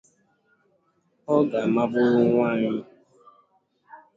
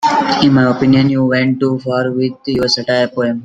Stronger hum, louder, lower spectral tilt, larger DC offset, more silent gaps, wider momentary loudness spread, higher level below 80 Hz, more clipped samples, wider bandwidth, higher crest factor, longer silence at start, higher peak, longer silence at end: neither; second, -22 LUFS vs -13 LUFS; first, -8.5 dB/octave vs -6 dB/octave; neither; neither; first, 9 LU vs 6 LU; second, -68 dBFS vs -48 dBFS; neither; second, 7.4 kHz vs 9 kHz; first, 18 dB vs 12 dB; first, 1.3 s vs 0 s; second, -8 dBFS vs 0 dBFS; first, 0.2 s vs 0 s